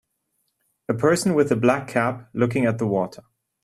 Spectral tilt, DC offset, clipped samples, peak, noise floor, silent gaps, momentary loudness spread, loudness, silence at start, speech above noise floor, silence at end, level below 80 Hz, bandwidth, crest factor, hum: -6 dB/octave; under 0.1%; under 0.1%; -4 dBFS; -73 dBFS; none; 8 LU; -22 LUFS; 0.9 s; 52 dB; 0.5 s; -60 dBFS; 13.5 kHz; 20 dB; none